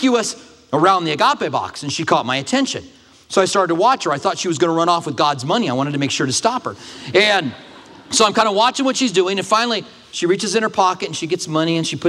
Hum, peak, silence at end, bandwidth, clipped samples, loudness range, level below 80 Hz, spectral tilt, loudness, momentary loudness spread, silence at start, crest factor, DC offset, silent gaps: none; 0 dBFS; 0 s; 13.5 kHz; under 0.1%; 2 LU; -62 dBFS; -3.5 dB/octave; -17 LUFS; 9 LU; 0 s; 18 dB; under 0.1%; none